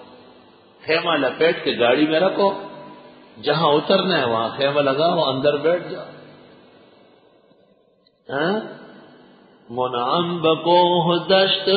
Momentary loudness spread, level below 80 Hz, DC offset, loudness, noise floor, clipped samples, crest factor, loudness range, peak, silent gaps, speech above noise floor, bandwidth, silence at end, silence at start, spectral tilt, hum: 16 LU; -64 dBFS; under 0.1%; -19 LUFS; -59 dBFS; under 0.1%; 18 dB; 11 LU; -2 dBFS; none; 41 dB; 5 kHz; 0 s; 0 s; -10 dB/octave; none